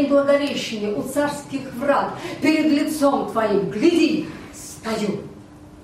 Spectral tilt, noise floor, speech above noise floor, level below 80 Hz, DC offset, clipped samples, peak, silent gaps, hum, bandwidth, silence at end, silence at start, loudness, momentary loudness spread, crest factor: -5 dB/octave; -42 dBFS; 22 dB; -54 dBFS; under 0.1%; under 0.1%; -4 dBFS; none; none; 15.5 kHz; 0 s; 0 s; -21 LUFS; 14 LU; 16 dB